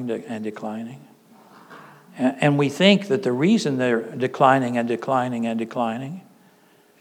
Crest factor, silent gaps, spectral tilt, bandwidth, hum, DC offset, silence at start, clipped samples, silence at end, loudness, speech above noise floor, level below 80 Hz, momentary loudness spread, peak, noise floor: 20 dB; none; -6 dB/octave; 14 kHz; none; under 0.1%; 0 s; under 0.1%; 0.8 s; -21 LUFS; 35 dB; -84 dBFS; 15 LU; -2 dBFS; -56 dBFS